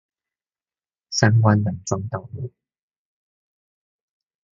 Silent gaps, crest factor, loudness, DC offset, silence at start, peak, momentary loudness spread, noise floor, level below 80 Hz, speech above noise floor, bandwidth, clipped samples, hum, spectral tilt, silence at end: none; 24 dB; -21 LUFS; under 0.1%; 1.1 s; 0 dBFS; 18 LU; under -90 dBFS; -50 dBFS; over 70 dB; 7.6 kHz; under 0.1%; none; -5.5 dB/octave; 2.05 s